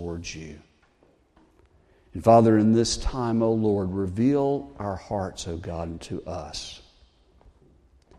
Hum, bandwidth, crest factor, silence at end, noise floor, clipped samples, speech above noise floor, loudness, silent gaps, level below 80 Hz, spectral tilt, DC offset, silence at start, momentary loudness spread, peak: none; 11.5 kHz; 22 dB; 1.4 s; -62 dBFS; under 0.1%; 38 dB; -24 LUFS; none; -44 dBFS; -6 dB/octave; under 0.1%; 0 s; 18 LU; -4 dBFS